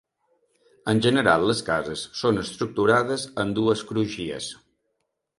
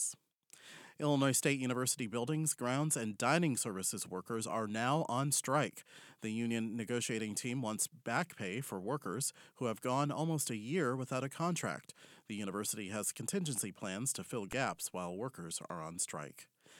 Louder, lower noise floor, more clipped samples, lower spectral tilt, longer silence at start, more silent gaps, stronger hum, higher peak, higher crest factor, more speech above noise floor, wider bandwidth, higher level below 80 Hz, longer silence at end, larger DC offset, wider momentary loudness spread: first, -24 LUFS vs -37 LUFS; first, -77 dBFS vs -64 dBFS; neither; about the same, -5 dB/octave vs -4 dB/octave; first, 0.85 s vs 0 s; neither; neither; first, -4 dBFS vs -16 dBFS; about the same, 22 dB vs 22 dB; first, 54 dB vs 27 dB; second, 11.5 kHz vs 18.5 kHz; first, -56 dBFS vs -78 dBFS; first, 0.85 s vs 0 s; neither; about the same, 11 LU vs 11 LU